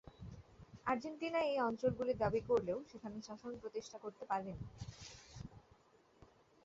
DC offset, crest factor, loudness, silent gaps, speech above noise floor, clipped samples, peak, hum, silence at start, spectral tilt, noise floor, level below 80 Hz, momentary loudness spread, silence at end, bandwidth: under 0.1%; 20 dB; -40 LUFS; none; 29 dB; under 0.1%; -22 dBFS; none; 0.05 s; -5 dB/octave; -69 dBFS; -64 dBFS; 19 LU; 1.05 s; 7.8 kHz